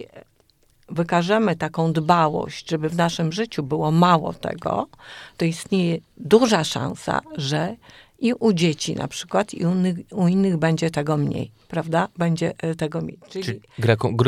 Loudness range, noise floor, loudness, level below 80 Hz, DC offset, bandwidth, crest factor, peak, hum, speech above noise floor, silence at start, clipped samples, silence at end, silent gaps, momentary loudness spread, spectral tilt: 3 LU; -60 dBFS; -22 LUFS; -56 dBFS; under 0.1%; 13 kHz; 20 dB; -2 dBFS; none; 39 dB; 0 s; under 0.1%; 0 s; none; 11 LU; -6 dB/octave